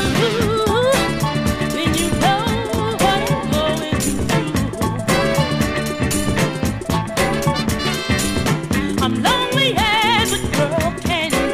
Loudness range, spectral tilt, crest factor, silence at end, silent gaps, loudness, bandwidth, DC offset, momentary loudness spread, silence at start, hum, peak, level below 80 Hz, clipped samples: 2 LU; -4.5 dB/octave; 14 dB; 0 s; none; -18 LUFS; 16 kHz; under 0.1%; 5 LU; 0 s; none; -4 dBFS; -34 dBFS; under 0.1%